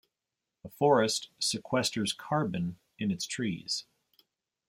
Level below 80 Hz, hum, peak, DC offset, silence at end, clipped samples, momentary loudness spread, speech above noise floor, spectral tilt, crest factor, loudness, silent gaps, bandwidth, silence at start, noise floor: -70 dBFS; none; -10 dBFS; under 0.1%; 0.85 s; under 0.1%; 10 LU; 58 dB; -4 dB/octave; 22 dB; -31 LUFS; none; 16 kHz; 0.65 s; -88 dBFS